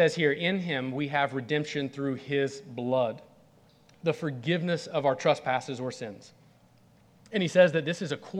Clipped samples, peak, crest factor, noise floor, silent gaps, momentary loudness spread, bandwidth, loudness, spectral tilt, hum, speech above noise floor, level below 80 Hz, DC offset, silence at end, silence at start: under 0.1%; -8 dBFS; 22 dB; -60 dBFS; none; 12 LU; 10.5 kHz; -28 LUFS; -5.5 dB/octave; none; 32 dB; -74 dBFS; under 0.1%; 0 s; 0 s